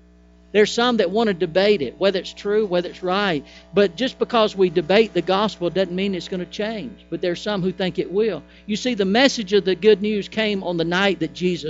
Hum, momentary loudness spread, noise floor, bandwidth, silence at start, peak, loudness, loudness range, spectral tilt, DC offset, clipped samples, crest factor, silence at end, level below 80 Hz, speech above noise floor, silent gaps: none; 9 LU; -50 dBFS; 8 kHz; 0.55 s; -4 dBFS; -20 LUFS; 4 LU; -5 dB/octave; under 0.1%; under 0.1%; 18 dB; 0 s; -52 dBFS; 30 dB; none